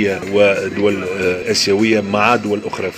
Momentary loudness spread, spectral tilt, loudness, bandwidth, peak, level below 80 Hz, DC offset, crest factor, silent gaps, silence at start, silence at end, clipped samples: 5 LU; -4 dB/octave; -15 LUFS; 16 kHz; 0 dBFS; -56 dBFS; under 0.1%; 16 dB; none; 0 s; 0 s; under 0.1%